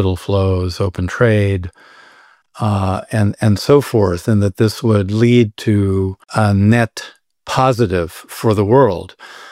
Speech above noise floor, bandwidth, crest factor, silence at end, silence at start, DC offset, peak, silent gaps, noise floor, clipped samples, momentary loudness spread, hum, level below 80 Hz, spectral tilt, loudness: 33 dB; 15 kHz; 14 dB; 0 s; 0 s; under 0.1%; -2 dBFS; none; -48 dBFS; under 0.1%; 11 LU; none; -42 dBFS; -7 dB/octave; -15 LUFS